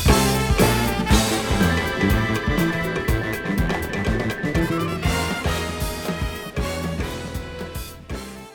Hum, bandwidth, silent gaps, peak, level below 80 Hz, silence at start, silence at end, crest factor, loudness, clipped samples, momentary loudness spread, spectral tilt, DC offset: none; over 20 kHz; none; -2 dBFS; -30 dBFS; 0 s; 0 s; 20 dB; -22 LUFS; under 0.1%; 13 LU; -5 dB/octave; under 0.1%